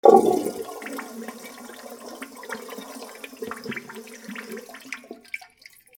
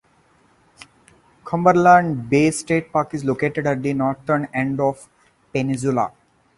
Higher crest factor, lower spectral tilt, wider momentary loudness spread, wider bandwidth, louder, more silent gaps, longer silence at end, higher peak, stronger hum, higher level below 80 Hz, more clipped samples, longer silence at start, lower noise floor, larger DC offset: first, 26 dB vs 20 dB; second, -4.5 dB/octave vs -6.5 dB/octave; first, 14 LU vs 10 LU; first, 19.5 kHz vs 11.5 kHz; second, -29 LUFS vs -19 LUFS; neither; about the same, 0.6 s vs 0.5 s; about the same, 0 dBFS vs 0 dBFS; neither; second, -72 dBFS vs -56 dBFS; neither; second, 0.05 s vs 1.45 s; second, -52 dBFS vs -58 dBFS; neither